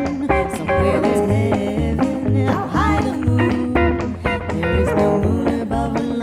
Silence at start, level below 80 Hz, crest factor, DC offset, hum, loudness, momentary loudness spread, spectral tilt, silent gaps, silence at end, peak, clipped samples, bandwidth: 0 s; -30 dBFS; 14 dB; under 0.1%; none; -19 LUFS; 4 LU; -7.5 dB/octave; none; 0 s; -4 dBFS; under 0.1%; 14 kHz